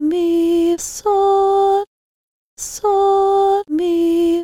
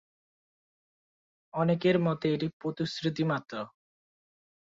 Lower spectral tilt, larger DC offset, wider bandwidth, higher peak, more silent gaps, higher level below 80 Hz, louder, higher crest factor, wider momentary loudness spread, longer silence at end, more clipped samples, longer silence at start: second, -3.5 dB/octave vs -7 dB/octave; neither; first, 16 kHz vs 7.6 kHz; first, -6 dBFS vs -14 dBFS; first, 1.87-2.56 s vs 2.53-2.60 s; first, -50 dBFS vs -70 dBFS; first, -16 LUFS vs -30 LUFS; second, 10 dB vs 20 dB; second, 7 LU vs 14 LU; second, 0 s vs 1.05 s; neither; second, 0 s vs 1.55 s